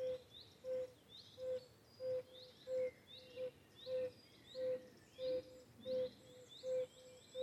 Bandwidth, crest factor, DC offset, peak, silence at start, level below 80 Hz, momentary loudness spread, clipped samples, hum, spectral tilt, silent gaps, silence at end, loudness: 14 kHz; 12 dB; under 0.1%; -34 dBFS; 0 s; -82 dBFS; 15 LU; under 0.1%; none; -4.5 dB/octave; none; 0 s; -47 LUFS